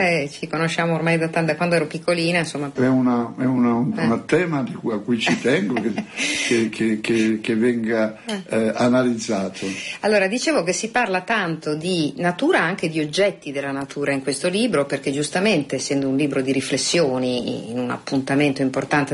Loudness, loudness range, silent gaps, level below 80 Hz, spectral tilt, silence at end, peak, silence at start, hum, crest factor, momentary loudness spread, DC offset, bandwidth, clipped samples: -21 LUFS; 1 LU; none; -60 dBFS; -4.5 dB/octave; 0 s; -6 dBFS; 0 s; none; 14 dB; 7 LU; under 0.1%; 11.5 kHz; under 0.1%